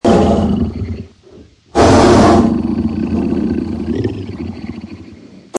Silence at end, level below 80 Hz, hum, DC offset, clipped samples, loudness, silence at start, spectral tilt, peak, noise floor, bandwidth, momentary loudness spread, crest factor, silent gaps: 0 s; -30 dBFS; none; under 0.1%; under 0.1%; -13 LUFS; 0.05 s; -6.5 dB/octave; 0 dBFS; -41 dBFS; 11 kHz; 20 LU; 14 dB; none